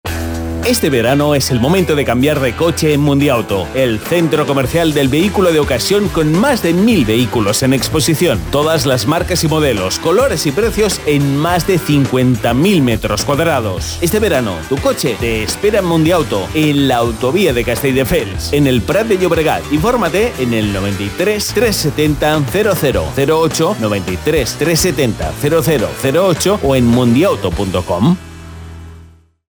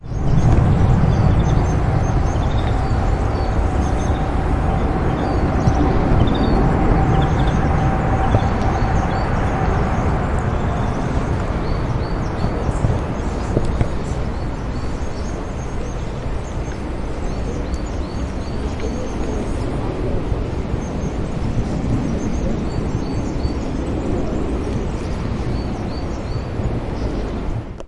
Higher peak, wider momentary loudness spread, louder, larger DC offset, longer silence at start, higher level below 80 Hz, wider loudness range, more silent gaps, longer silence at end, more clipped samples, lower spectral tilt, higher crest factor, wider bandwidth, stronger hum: about the same, -2 dBFS vs 0 dBFS; second, 5 LU vs 9 LU; first, -13 LUFS vs -21 LUFS; neither; about the same, 0.05 s vs 0 s; second, -30 dBFS vs -24 dBFS; second, 2 LU vs 8 LU; neither; first, 0.45 s vs 0 s; neither; second, -5 dB/octave vs -7.5 dB/octave; second, 10 dB vs 18 dB; first, over 20 kHz vs 11 kHz; neither